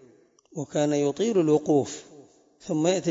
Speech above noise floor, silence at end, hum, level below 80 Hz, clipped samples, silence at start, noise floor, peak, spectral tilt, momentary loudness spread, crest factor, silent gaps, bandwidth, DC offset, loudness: 33 dB; 0 s; none; -70 dBFS; under 0.1%; 0.55 s; -57 dBFS; -10 dBFS; -5.5 dB/octave; 18 LU; 16 dB; none; 7.8 kHz; under 0.1%; -25 LUFS